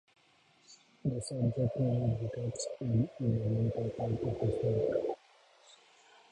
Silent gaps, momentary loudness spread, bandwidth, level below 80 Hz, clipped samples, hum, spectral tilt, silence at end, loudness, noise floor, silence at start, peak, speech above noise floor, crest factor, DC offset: none; 6 LU; 11 kHz; -58 dBFS; under 0.1%; none; -7.5 dB/octave; 1.15 s; -34 LUFS; -67 dBFS; 0.7 s; -20 dBFS; 35 dB; 14 dB; under 0.1%